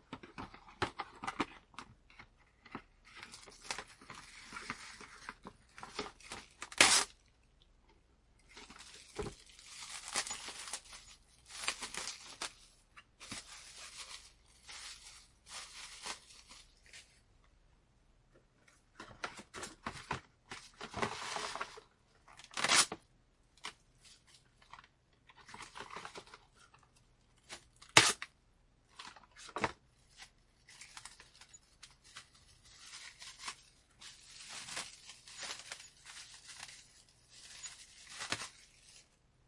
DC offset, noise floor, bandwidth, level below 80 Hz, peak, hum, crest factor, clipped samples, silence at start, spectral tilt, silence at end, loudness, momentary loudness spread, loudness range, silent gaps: under 0.1%; -70 dBFS; 11.5 kHz; -68 dBFS; -4 dBFS; none; 40 dB; under 0.1%; 0.1 s; -0.5 dB/octave; 0.45 s; -37 LUFS; 20 LU; 18 LU; none